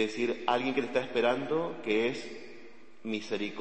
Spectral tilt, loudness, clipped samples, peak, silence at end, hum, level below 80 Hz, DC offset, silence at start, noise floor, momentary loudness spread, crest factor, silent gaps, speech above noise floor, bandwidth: -5 dB/octave; -31 LUFS; under 0.1%; -10 dBFS; 0 s; none; -74 dBFS; 0.5%; 0 s; -54 dBFS; 15 LU; 22 dB; none; 23 dB; 8.8 kHz